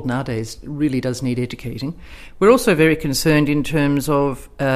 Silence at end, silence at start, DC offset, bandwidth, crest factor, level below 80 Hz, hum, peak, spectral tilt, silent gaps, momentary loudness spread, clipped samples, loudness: 0 s; 0 s; under 0.1%; 15.5 kHz; 18 dB; -38 dBFS; none; 0 dBFS; -5.5 dB/octave; none; 14 LU; under 0.1%; -18 LUFS